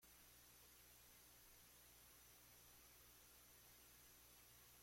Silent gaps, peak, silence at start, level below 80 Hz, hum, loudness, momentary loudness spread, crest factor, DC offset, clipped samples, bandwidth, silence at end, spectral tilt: none; -56 dBFS; 0 s; -80 dBFS; none; -66 LUFS; 0 LU; 12 dB; under 0.1%; under 0.1%; 16.5 kHz; 0 s; -1.5 dB/octave